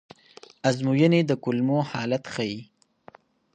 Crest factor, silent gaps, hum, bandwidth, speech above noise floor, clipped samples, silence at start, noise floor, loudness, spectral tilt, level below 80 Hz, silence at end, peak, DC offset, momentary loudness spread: 18 dB; none; none; 9.4 kHz; 30 dB; under 0.1%; 0.65 s; -53 dBFS; -24 LUFS; -6.5 dB/octave; -68 dBFS; 0.9 s; -8 dBFS; under 0.1%; 10 LU